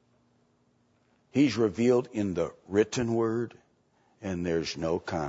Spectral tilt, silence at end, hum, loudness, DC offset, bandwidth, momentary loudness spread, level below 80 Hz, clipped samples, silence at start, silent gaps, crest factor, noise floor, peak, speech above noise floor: -6 dB/octave; 0 s; none; -29 LUFS; under 0.1%; 8 kHz; 9 LU; -58 dBFS; under 0.1%; 1.35 s; none; 18 dB; -68 dBFS; -10 dBFS; 41 dB